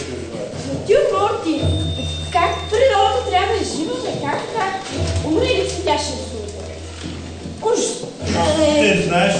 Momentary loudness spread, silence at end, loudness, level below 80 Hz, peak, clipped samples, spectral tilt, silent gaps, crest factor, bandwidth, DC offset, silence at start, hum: 14 LU; 0 s; -19 LUFS; -38 dBFS; -2 dBFS; under 0.1%; -4.5 dB/octave; none; 16 dB; 9.4 kHz; under 0.1%; 0 s; none